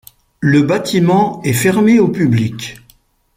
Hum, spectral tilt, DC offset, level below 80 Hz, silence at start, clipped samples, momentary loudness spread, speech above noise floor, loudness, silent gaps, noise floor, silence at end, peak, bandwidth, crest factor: none; -6 dB/octave; under 0.1%; -50 dBFS; 0.4 s; under 0.1%; 9 LU; 39 dB; -13 LUFS; none; -52 dBFS; 0.65 s; -2 dBFS; 16.5 kHz; 12 dB